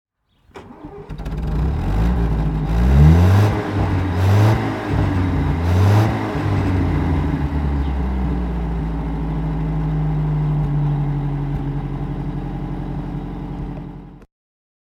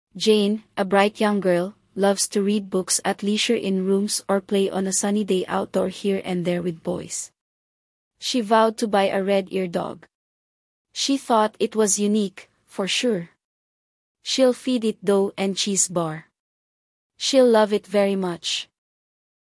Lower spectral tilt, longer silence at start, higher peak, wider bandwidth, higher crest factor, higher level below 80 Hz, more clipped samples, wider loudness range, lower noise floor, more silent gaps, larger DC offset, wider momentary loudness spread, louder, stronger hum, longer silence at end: first, -8.5 dB/octave vs -4 dB/octave; first, 0.55 s vs 0.15 s; first, 0 dBFS vs -4 dBFS; first, 13.5 kHz vs 12 kHz; about the same, 18 dB vs 18 dB; first, -24 dBFS vs -68 dBFS; neither; first, 8 LU vs 3 LU; second, -53 dBFS vs under -90 dBFS; second, none vs 7.41-8.11 s, 10.15-10.85 s, 13.45-14.15 s, 16.40-17.10 s; neither; first, 14 LU vs 10 LU; first, -19 LUFS vs -22 LUFS; neither; second, 0.65 s vs 0.8 s